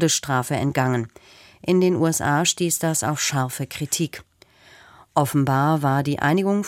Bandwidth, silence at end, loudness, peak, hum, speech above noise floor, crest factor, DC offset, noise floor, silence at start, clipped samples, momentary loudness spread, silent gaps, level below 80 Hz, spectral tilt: 16.5 kHz; 0 s; -21 LUFS; -4 dBFS; none; 31 dB; 18 dB; under 0.1%; -52 dBFS; 0 s; under 0.1%; 8 LU; none; -56 dBFS; -4.5 dB/octave